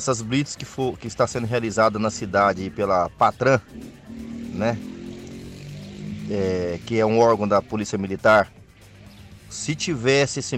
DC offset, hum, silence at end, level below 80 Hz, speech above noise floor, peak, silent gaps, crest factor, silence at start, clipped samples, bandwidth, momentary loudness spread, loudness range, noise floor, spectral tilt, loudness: under 0.1%; none; 0 s; -50 dBFS; 25 dB; -6 dBFS; none; 16 dB; 0 s; under 0.1%; 14.5 kHz; 19 LU; 6 LU; -46 dBFS; -5 dB/octave; -22 LUFS